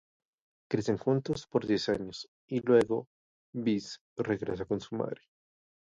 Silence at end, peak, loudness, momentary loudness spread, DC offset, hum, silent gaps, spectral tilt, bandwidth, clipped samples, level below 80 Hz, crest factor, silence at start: 0.7 s; -12 dBFS; -32 LUFS; 14 LU; under 0.1%; none; 2.28-2.48 s, 3.07-3.53 s, 4.01-4.16 s; -6.5 dB/octave; 11 kHz; under 0.1%; -62 dBFS; 22 dB; 0.7 s